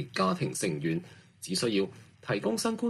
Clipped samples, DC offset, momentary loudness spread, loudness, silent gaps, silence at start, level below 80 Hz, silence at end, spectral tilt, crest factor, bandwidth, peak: under 0.1%; under 0.1%; 8 LU; -31 LUFS; none; 0 s; -68 dBFS; 0 s; -4.5 dB/octave; 18 dB; 14.5 kHz; -14 dBFS